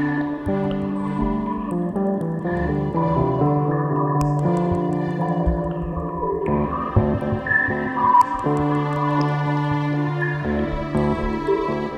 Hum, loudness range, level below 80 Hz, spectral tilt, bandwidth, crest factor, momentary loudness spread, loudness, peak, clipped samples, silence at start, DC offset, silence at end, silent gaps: none; 2 LU; -36 dBFS; -8.5 dB/octave; 9.2 kHz; 16 dB; 5 LU; -22 LUFS; -4 dBFS; under 0.1%; 0 s; under 0.1%; 0 s; none